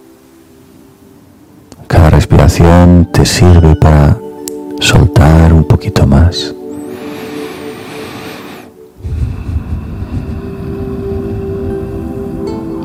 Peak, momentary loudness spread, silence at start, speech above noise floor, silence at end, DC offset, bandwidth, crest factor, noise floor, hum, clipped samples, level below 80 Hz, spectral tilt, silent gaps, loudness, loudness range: 0 dBFS; 18 LU; 1.8 s; 35 dB; 0 s; under 0.1%; 15 kHz; 10 dB; -40 dBFS; none; 3%; -18 dBFS; -6.5 dB/octave; none; -9 LUFS; 15 LU